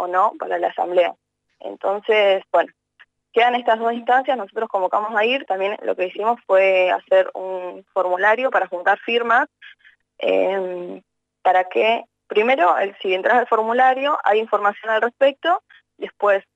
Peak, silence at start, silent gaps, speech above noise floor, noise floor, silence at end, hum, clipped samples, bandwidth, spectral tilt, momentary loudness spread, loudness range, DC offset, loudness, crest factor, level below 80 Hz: -6 dBFS; 0 s; none; 36 dB; -55 dBFS; 0.15 s; 50 Hz at -80 dBFS; under 0.1%; 7.8 kHz; -4.5 dB/octave; 9 LU; 3 LU; under 0.1%; -19 LUFS; 14 dB; -78 dBFS